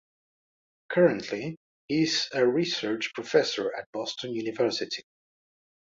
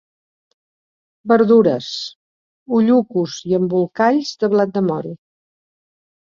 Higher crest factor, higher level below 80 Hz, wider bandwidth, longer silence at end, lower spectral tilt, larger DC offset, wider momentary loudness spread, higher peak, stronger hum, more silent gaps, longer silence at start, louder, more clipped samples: about the same, 20 dB vs 16 dB; second, -72 dBFS vs -62 dBFS; about the same, 7.8 kHz vs 7.4 kHz; second, 0.85 s vs 1.25 s; second, -4.5 dB/octave vs -6.5 dB/octave; neither; second, 11 LU vs 14 LU; second, -8 dBFS vs -2 dBFS; neither; second, 1.57-1.88 s, 3.86-3.93 s vs 2.16-2.66 s; second, 0.9 s vs 1.25 s; second, -27 LUFS vs -17 LUFS; neither